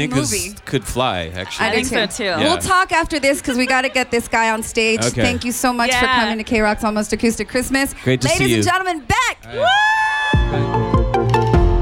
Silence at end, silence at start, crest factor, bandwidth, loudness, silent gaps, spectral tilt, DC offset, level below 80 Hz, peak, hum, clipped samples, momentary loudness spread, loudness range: 0 s; 0 s; 12 dB; 17 kHz; -17 LUFS; none; -4 dB/octave; under 0.1%; -28 dBFS; -4 dBFS; none; under 0.1%; 5 LU; 1 LU